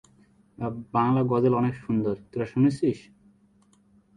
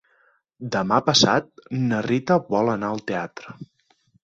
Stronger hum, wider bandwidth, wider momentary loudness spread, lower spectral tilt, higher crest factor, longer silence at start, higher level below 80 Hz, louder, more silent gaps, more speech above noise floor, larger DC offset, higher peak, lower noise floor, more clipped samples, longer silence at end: neither; first, 10 kHz vs 8.2 kHz; second, 12 LU vs 20 LU; first, -9 dB/octave vs -4.5 dB/octave; about the same, 18 dB vs 22 dB; about the same, 0.6 s vs 0.6 s; about the same, -60 dBFS vs -60 dBFS; second, -26 LUFS vs -22 LUFS; neither; second, 37 dB vs 41 dB; neither; second, -8 dBFS vs -2 dBFS; about the same, -61 dBFS vs -63 dBFS; neither; first, 1.2 s vs 0.6 s